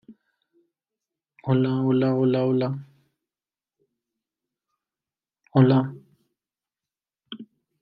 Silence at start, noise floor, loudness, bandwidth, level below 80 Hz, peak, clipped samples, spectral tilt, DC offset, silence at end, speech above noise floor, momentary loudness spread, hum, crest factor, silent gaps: 0.1 s; under -90 dBFS; -22 LUFS; 4.9 kHz; -70 dBFS; -4 dBFS; under 0.1%; -11 dB/octave; under 0.1%; 0.35 s; over 70 dB; 22 LU; none; 22 dB; none